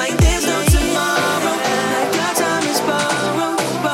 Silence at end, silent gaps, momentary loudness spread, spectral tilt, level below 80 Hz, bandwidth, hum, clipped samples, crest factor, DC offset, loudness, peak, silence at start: 0 s; none; 3 LU; -4 dB/octave; -26 dBFS; 16.5 kHz; none; under 0.1%; 14 dB; under 0.1%; -17 LUFS; -2 dBFS; 0 s